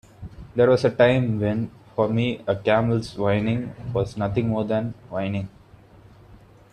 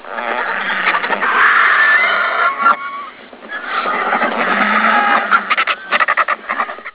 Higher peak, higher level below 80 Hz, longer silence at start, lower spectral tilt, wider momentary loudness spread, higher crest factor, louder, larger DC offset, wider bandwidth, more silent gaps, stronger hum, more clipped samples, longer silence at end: second, -4 dBFS vs 0 dBFS; first, -50 dBFS vs -64 dBFS; first, 0.2 s vs 0 s; first, -8 dB/octave vs -5.5 dB/octave; about the same, 12 LU vs 11 LU; about the same, 18 dB vs 14 dB; second, -23 LUFS vs -13 LUFS; neither; first, 10 kHz vs 4 kHz; neither; neither; neither; first, 0.35 s vs 0.05 s